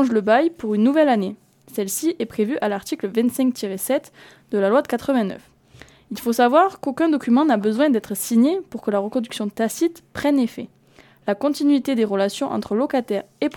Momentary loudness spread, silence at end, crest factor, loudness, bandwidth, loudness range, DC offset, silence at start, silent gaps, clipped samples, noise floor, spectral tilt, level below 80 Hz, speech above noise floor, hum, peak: 10 LU; 0 s; 18 dB; -21 LUFS; 19 kHz; 4 LU; under 0.1%; 0 s; none; under 0.1%; -52 dBFS; -5 dB/octave; -62 dBFS; 32 dB; none; -2 dBFS